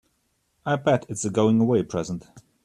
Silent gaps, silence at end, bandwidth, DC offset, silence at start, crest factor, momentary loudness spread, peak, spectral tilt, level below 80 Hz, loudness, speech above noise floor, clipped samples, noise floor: none; 0.25 s; 11 kHz; under 0.1%; 0.65 s; 16 dB; 14 LU; -8 dBFS; -6 dB/octave; -60 dBFS; -23 LUFS; 48 dB; under 0.1%; -71 dBFS